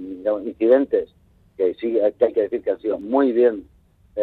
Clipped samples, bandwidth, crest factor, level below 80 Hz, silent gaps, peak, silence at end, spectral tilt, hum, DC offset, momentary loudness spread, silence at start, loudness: under 0.1%; 4.4 kHz; 16 dB; -58 dBFS; none; -4 dBFS; 0 s; -8.5 dB/octave; none; under 0.1%; 8 LU; 0 s; -20 LUFS